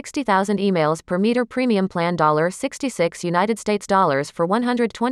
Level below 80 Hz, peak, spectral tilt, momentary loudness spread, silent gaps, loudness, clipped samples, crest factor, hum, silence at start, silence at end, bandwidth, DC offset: -58 dBFS; -4 dBFS; -5.5 dB/octave; 5 LU; none; -20 LUFS; under 0.1%; 16 dB; none; 0.05 s; 0 s; 13.5 kHz; under 0.1%